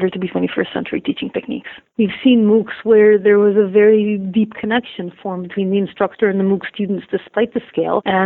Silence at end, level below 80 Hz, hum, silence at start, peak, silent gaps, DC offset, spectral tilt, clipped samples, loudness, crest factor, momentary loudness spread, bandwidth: 0 s; -58 dBFS; none; 0 s; 0 dBFS; none; under 0.1%; -10 dB/octave; under 0.1%; -16 LUFS; 14 dB; 12 LU; 4.1 kHz